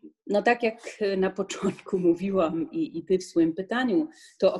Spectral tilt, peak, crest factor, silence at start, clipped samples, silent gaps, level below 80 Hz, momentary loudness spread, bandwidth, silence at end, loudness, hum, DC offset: -6 dB/octave; -8 dBFS; 18 dB; 0.05 s; under 0.1%; none; -64 dBFS; 7 LU; 11.5 kHz; 0 s; -27 LUFS; none; under 0.1%